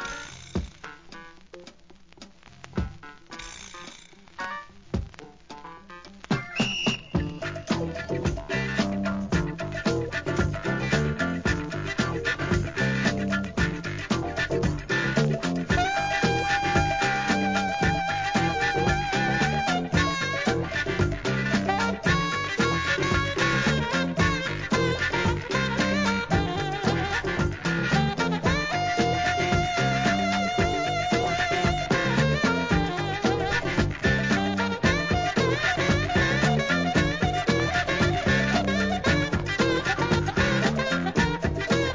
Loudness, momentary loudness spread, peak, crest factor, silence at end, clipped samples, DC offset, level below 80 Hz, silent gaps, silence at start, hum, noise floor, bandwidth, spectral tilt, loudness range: -25 LUFS; 11 LU; -6 dBFS; 18 dB; 0 s; under 0.1%; 0.2%; -40 dBFS; none; 0 s; none; -53 dBFS; 7.6 kHz; -5 dB/octave; 8 LU